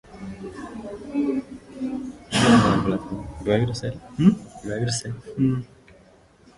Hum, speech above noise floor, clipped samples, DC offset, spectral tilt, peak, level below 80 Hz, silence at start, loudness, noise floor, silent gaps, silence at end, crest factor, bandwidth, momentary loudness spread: none; 30 dB; under 0.1%; under 0.1%; -5.5 dB/octave; -4 dBFS; -46 dBFS; 0.1 s; -23 LUFS; -53 dBFS; none; 0.9 s; 20 dB; 11.5 kHz; 19 LU